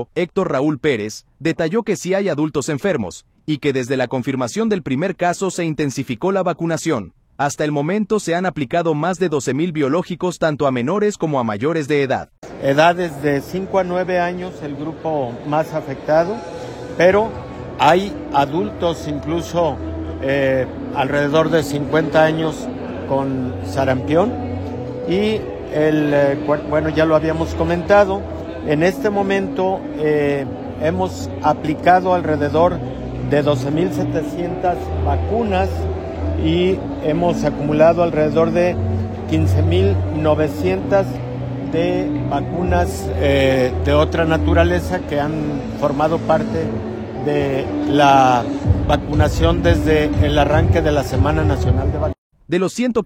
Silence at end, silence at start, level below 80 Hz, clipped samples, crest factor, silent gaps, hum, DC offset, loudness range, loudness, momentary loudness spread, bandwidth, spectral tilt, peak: 0 s; 0 s; -34 dBFS; under 0.1%; 18 dB; 12.38-12.42 s, 52.18-52.30 s; none; under 0.1%; 4 LU; -18 LUFS; 9 LU; 16 kHz; -6.5 dB/octave; 0 dBFS